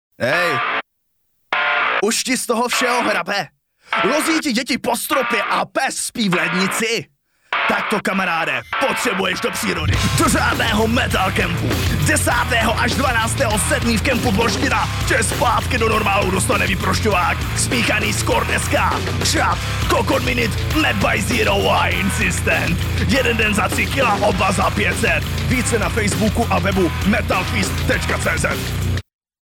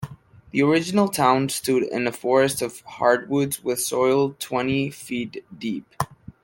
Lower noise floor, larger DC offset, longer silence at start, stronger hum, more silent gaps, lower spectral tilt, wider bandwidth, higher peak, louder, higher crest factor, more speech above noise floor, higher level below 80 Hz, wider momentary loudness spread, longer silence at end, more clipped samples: first, -68 dBFS vs -42 dBFS; neither; first, 0.2 s vs 0 s; neither; neither; about the same, -4 dB/octave vs -4.5 dB/octave; about the same, 18 kHz vs 17 kHz; about the same, -4 dBFS vs -4 dBFS; first, -17 LUFS vs -23 LUFS; about the same, 14 dB vs 18 dB; first, 51 dB vs 20 dB; first, -32 dBFS vs -58 dBFS; second, 4 LU vs 12 LU; first, 0.4 s vs 0.15 s; neither